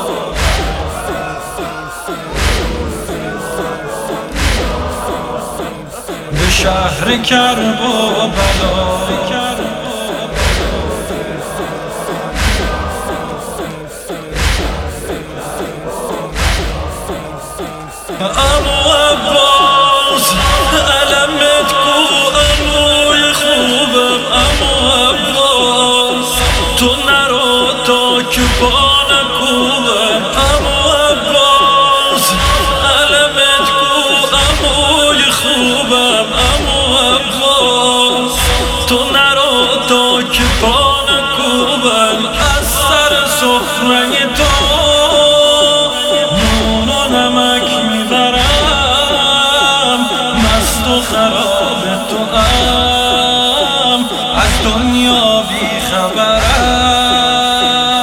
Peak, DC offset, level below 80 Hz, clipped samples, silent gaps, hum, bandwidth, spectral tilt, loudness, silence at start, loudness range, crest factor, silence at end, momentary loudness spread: 0 dBFS; under 0.1%; -22 dBFS; under 0.1%; none; none; 18 kHz; -3 dB/octave; -10 LUFS; 0 s; 9 LU; 12 dB; 0 s; 12 LU